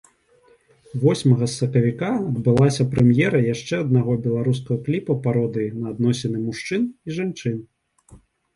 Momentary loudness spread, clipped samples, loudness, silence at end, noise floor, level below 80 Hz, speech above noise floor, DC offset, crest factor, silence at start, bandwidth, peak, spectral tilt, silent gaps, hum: 9 LU; under 0.1%; -21 LUFS; 0.4 s; -57 dBFS; -52 dBFS; 37 dB; under 0.1%; 18 dB; 0.95 s; 11.5 kHz; -4 dBFS; -7 dB/octave; none; none